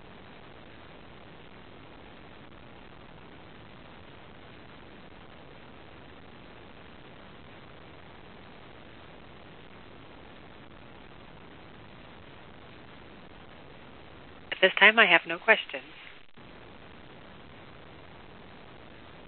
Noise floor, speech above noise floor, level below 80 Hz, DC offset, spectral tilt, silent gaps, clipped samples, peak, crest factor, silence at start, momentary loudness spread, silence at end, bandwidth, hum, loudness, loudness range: -51 dBFS; 28 dB; -60 dBFS; 0.2%; 0 dB/octave; none; under 0.1%; -2 dBFS; 32 dB; 14.5 s; 26 LU; 3.45 s; 4.5 kHz; none; -22 LUFS; 25 LU